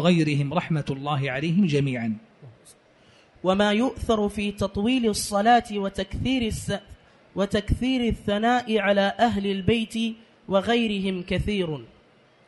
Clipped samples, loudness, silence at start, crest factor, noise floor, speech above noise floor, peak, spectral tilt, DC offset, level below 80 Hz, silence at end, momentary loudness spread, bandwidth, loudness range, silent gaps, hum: under 0.1%; -24 LUFS; 0 s; 18 dB; -57 dBFS; 34 dB; -6 dBFS; -5.5 dB/octave; under 0.1%; -42 dBFS; 0.6 s; 9 LU; 11.5 kHz; 3 LU; none; none